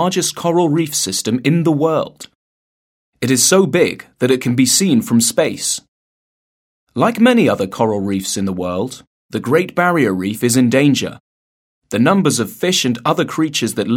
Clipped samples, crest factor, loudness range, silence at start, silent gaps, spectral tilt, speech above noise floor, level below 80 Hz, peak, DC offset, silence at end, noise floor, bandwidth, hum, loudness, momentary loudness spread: under 0.1%; 16 dB; 3 LU; 0 s; 2.35-3.13 s, 5.88-6.87 s, 9.07-9.29 s, 11.20-11.82 s; -4 dB/octave; over 75 dB; -58 dBFS; 0 dBFS; under 0.1%; 0 s; under -90 dBFS; 17 kHz; none; -15 LUFS; 9 LU